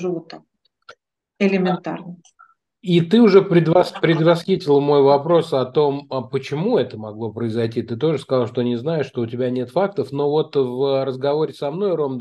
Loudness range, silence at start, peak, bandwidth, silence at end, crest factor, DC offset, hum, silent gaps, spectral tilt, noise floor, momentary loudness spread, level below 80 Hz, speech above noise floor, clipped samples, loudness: 7 LU; 0 s; 0 dBFS; 11.5 kHz; 0 s; 18 dB; under 0.1%; none; none; -8 dB/octave; -54 dBFS; 12 LU; -68 dBFS; 35 dB; under 0.1%; -19 LUFS